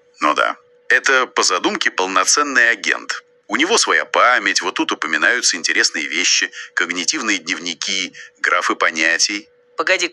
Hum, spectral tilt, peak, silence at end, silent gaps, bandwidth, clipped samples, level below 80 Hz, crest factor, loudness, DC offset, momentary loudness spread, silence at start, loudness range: none; 0.5 dB/octave; 0 dBFS; 0 s; none; 12.5 kHz; under 0.1%; -74 dBFS; 18 dB; -16 LUFS; under 0.1%; 8 LU; 0.2 s; 3 LU